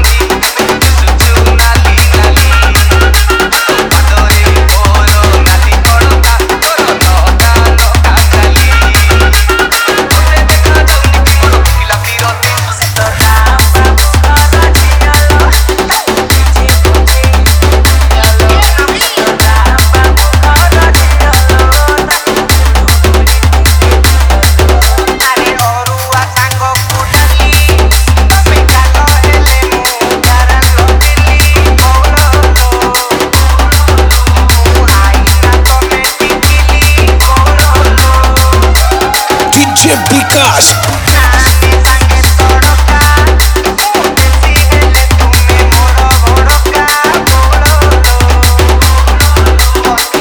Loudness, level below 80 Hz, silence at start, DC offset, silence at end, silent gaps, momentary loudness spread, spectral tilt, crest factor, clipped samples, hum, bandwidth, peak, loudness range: -6 LUFS; -8 dBFS; 0 s; under 0.1%; 0 s; none; 3 LU; -4 dB/octave; 6 dB; 0.9%; none; over 20 kHz; 0 dBFS; 1 LU